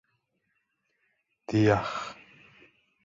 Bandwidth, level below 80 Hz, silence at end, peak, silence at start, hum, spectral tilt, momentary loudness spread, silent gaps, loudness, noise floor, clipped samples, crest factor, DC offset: 7.6 kHz; -58 dBFS; 0.9 s; -8 dBFS; 1.5 s; none; -7 dB/octave; 18 LU; none; -27 LUFS; -77 dBFS; under 0.1%; 24 dB; under 0.1%